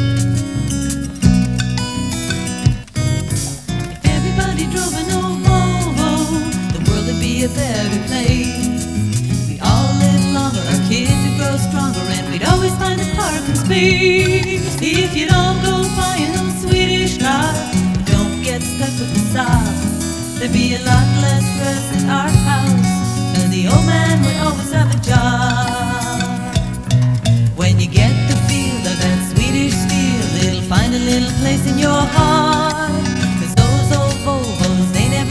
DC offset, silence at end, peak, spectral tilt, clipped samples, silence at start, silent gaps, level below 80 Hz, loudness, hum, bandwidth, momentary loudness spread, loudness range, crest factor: 0.4%; 0 s; 0 dBFS; -5 dB/octave; under 0.1%; 0 s; none; -28 dBFS; -16 LUFS; none; 11 kHz; 6 LU; 3 LU; 14 dB